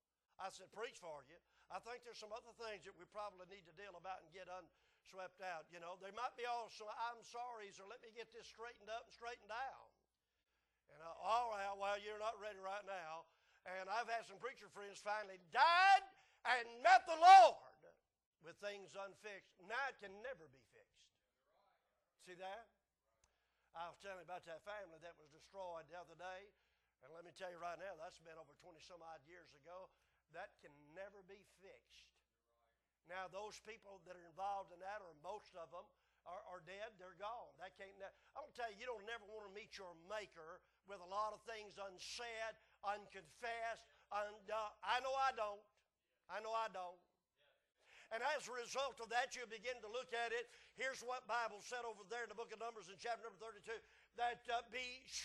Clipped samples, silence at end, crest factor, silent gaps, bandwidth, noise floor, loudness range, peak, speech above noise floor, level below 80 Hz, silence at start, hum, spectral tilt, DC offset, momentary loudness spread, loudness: under 0.1%; 0 s; 28 dB; 18.26-18.32 s; 12 kHz; -88 dBFS; 22 LU; -16 dBFS; 44 dB; -82 dBFS; 0.4 s; none; -1.5 dB/octave; under 0.1%; 18 LU; -42 LUFS